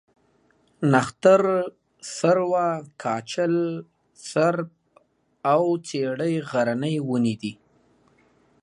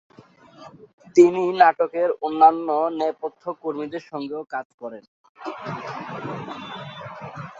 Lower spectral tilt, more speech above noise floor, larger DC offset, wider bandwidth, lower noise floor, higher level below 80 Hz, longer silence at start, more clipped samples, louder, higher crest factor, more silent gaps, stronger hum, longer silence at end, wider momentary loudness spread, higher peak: about the same, -6 dB/octave vs -6 dB/octave; first, 41 dB vs 29 dB; neither; first, 11.5 kHz vs 7.8 kHz; first, -63 dBFS vs -50 dBFS; about the same, -68 dBFS vs -68 dBFS; first, 0.8 s vs 0.6 s; neither; about the same, -23 LUFS vs -22 LUFS; about the same, 22 dB vs 22 dB; second, none vs 0.93-0.98 s, 4.65-4.78 s, 5.08-5.35 s; neither; first, 1.1 s vs 0 s; second, 15 LU vs 20 LU; about the same, -2 dBFS vs -2 dBFS